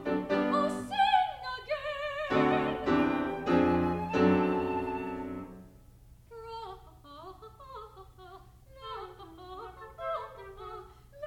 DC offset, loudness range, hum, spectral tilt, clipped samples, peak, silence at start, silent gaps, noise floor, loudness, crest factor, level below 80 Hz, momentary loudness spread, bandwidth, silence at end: under 0.1%; 18 LU; none; -6.5 dB/octave; under 0.1%; -14 dBFS; 0 s; none; -55 dBFS; -30 LUFS; 18 dB; -56 dBFS; 23 LU; 15 kHz; 0 s